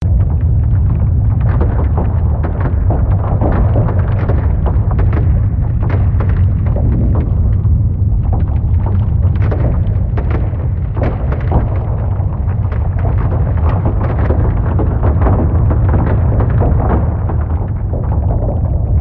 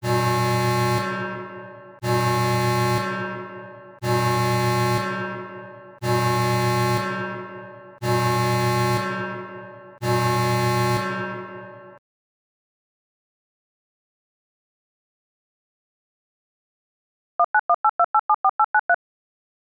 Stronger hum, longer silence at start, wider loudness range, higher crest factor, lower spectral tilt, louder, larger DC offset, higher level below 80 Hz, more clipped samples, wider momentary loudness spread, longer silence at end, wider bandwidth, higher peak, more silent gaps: neither; about the same, 0 s vs 0 s; second, 2 LU vs 5 LU; about the same, 12 dB vs 16 dB; first, -12 dB/octave vs -5.5 dB/octave; first, -14 LUFS vs -22 LUFS; first, 0.3% vs under 0.1%; first, -16 dBFS vs -60 dBFS; neither; second, 4 LU vs 17 LU; second, 0 s vs 0.65 s; second, 3.3 kHz vs over 20 kHz; first, 0 dBFS vs -10 dBFS; second, none vs 11.98-18.89 s